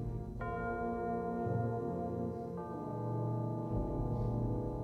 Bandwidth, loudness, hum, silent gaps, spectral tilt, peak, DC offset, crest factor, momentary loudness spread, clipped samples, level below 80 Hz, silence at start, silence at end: 4.2 kHz; -38 LUFS; none; none; -10.5 dB/octave; -24 dBFS; under 0.1%; 12 dB; 6 LU; under 0.1%; -48 dBFS; 0 s; 0 s